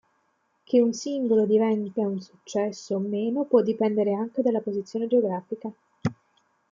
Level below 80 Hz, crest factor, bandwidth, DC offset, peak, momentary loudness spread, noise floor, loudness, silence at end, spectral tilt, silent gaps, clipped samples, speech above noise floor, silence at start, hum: -72 dBFS; 18 dB; 7.6 kHz; under 0.1%; -8 dBFS; 11 LU; -71 dBFS; -25 LUFS; 0.6 s; -7 dB/octave; none; under 0.1%; 46 dB; 0.7 s; none